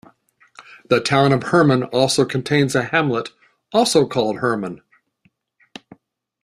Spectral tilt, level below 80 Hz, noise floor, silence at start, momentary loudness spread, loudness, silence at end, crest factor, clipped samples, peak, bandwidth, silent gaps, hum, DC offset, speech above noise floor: -5 dB/octave; -58 dBFS; -63 dBFS; 0.6 s; 10 LU; -18 LUFS; 1.7 s; 18 dB; under 0.1%; -2 dBFS; 13.5 kHz; none; none; under 0.1%; 46 dB